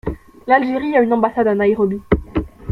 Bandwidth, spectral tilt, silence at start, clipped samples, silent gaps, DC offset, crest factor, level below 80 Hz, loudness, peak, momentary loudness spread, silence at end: 5.4 kHz; -9 dB/octave; 0.05 s; under 0.1%; none; under 0.1%; 16 dB; -34 dBFS; -17 LUFS; -2 dBFS; 10 LU; 0 s